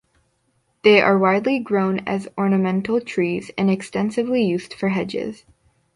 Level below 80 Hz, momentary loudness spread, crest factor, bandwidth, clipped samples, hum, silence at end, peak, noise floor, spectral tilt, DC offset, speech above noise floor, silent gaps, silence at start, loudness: -60 dBFS; 9 LU; 18 dB; 11 kHz; under 0.1%; none; 0.6 s; -2 dBFS; -67 dBFS; -6.5 dB/octave; under 0.1%; 47 dB; none; 0.85 s; -20 LUFS